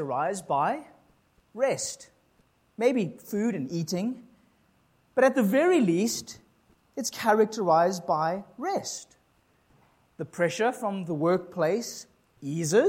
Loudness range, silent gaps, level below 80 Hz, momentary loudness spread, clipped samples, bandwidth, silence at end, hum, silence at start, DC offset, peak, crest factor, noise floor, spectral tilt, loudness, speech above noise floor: 6 LU; none; -72 dBFS; 16 LU; under 0.1%; 16.5 kHz; 0 s; none; 0 s; under 0.1%; -8 dBFS; 20 dB; -66 dBFS; -5 dB/octave; -27 LUFS; 40 dB